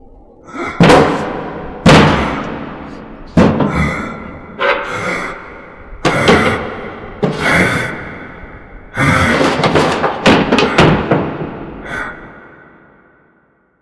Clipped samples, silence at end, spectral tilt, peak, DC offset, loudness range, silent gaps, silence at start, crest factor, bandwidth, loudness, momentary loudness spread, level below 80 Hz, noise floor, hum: under 0.1%; 1.35 s; -5.5 dB/octave; 0 dBFS; under 0.1%; 4 LU; none; 0.45 s; 14 dB; 11 kHz; -13 LUFS; 21 LU; -32 dBFS; -55 dBFS; none